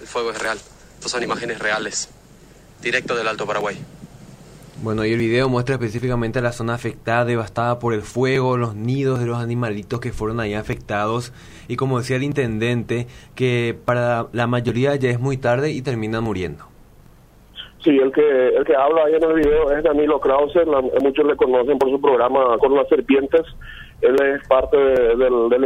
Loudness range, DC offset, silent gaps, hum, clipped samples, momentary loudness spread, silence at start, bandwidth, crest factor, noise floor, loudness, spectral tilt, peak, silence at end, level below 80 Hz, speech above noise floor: 7 LU; under 0.1%; none; none; under 0.1%; 10 LU; 0 s; 14 kHz; 16 dB; -47 dBFS; -19 LUFS; -6 dB/octave; -2 dBFS; 0 s; -42 dBFS; 29 dB